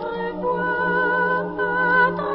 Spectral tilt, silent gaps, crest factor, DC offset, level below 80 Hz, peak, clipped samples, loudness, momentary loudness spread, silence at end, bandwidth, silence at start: -10.5 dB/octave; none; 14 dB; under 0.1%; -52 dBFS; -6 dBFS; under 0.1%; -21 LUFS; 7 LU; 0 s; 5.8 kHz; 0 s